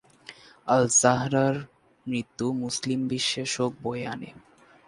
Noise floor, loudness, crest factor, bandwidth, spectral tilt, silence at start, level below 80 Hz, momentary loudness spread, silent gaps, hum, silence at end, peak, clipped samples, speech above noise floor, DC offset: -49 dBFS; -25 LUFS; 22 dB; 11.5 kHz; -3.5 dB/octave; 0.3 s; -64 dBFS; 19 LU; none; none; 0.5 s; -4 dBFS; under 0.1%; 24 dB; under 0.1%